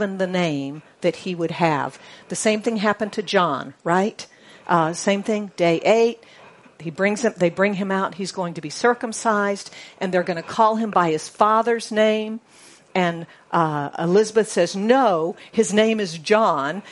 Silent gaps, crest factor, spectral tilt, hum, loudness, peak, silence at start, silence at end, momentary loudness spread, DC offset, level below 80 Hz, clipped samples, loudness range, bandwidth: none; 20 dB; -5 dB/octave; none; -21 LUFS; 0 dBFS; 0 s; 0 s; 11 LU; under 0.1%; -68 dBFS; under 0.1%; 3 LU; 11.5 kHz